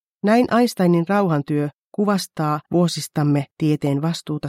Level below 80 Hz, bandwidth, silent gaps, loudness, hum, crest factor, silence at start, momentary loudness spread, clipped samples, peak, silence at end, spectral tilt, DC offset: -62 dBFS; 16 kHz; 1.74-1.91 s; -20 LUFS; none; 14 dB; 0.25 s; 6 LU; under 0.1%; -6 dBFS; 0 s; -6.5 dB/octave; under 0.1%